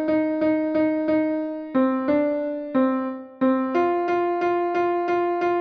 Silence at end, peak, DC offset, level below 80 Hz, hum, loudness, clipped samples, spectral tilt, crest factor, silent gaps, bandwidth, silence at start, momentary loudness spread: 0 s; -10 dBFS; under 0.1%; -62 dBFS; none; -23 LUFS; under 0.1%; -7.5 dB/octave; 12 dB; none; 6.2 kHz; 0 s; 4 LU